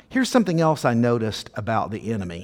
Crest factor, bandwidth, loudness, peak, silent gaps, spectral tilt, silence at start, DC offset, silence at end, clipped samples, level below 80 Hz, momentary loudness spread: 18 dB; 17 kHz; -22 LUFS; -4 dBFS; none; -6 dB/octave; 0.1 s; under 0.1%; 0 s; under 0.1%; -54 dBFS; 8 LU